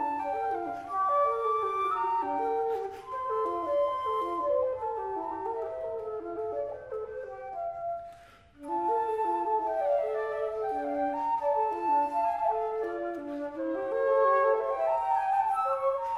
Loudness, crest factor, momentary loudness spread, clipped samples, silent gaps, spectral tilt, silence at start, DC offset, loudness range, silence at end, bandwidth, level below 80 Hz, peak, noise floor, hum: -30 LUFS; 14 dB; 10 LU; under 0.1%; none; -6 dB/octave; 0 s; under 0.1%; 7 LU; 0 s; 11.5 kHz; -64 dBFS; -14 dBFS; -54 dBFS; none